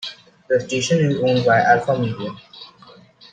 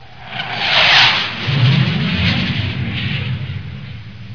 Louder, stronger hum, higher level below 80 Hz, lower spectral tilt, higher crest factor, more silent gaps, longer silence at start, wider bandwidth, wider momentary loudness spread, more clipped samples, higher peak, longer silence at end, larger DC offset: second, -18 LUFS vs -14 LUFS; neither; second, -60 dBFS vs -40 dBFS; about the same, -5.5 dB/octave vs -5 dB/octave; about the same, 18 dB vs 16 dB; neither; about the same, 0 s vs 0 s; first, 9.4 kHz vs 5.4 kHz; about the same, 21 LU vs 20 LU; neither; about the same, -2 dBFS vs 0 dBFS; first, 0.65 s vs 0 s; second, under 0.1% vs 1%